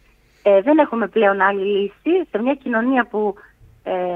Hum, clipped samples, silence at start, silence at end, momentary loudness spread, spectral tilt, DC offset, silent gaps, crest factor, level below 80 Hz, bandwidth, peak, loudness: none; under 0.1%; 0.45 s; 0 s; 9 LU; -8 dB/octave; under 0.1%; none; 18 dB; -58 dBFS; 4 kHz; -2 dBFS; -18 LUFS